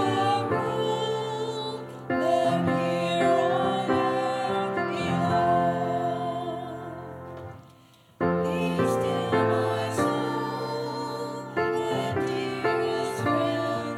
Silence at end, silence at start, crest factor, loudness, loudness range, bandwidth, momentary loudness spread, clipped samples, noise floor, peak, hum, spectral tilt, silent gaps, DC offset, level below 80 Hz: 0 s; 0 s; 16 dB; -26 LUFS; 4 LU; 16 kHz; 10 LU; under 0.1%; -55 dBFS; -10 dBFS; none; -6 dB/octave; none; under 0.1%; -62 dBFS